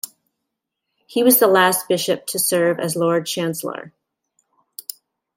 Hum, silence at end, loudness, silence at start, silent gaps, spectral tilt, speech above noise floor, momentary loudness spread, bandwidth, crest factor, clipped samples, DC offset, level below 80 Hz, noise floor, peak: none; 1.5 s; -18 LUFS; 0.05 s; none; -3.5 dB/octave; 61 dB; 21 LU; 16.5 kHz; 20 dB; under 0.1%; under 0.1%; -70 dBFS; -79 dBFS; 0 dBFS